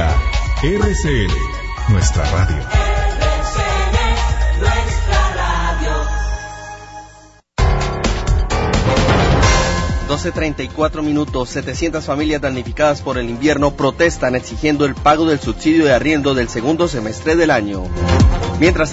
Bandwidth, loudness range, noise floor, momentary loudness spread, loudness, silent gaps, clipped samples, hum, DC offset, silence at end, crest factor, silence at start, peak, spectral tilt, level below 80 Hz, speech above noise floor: 8 kHz; 4 LU; -44 dBFS; 8 LU; -16 LUFS; none; under 0.1%; none; under 0.1%; 0 s; 14 dB; 0 s; 0 dBFS; -5.5 dB/octave; -20 dBFS; 28 dB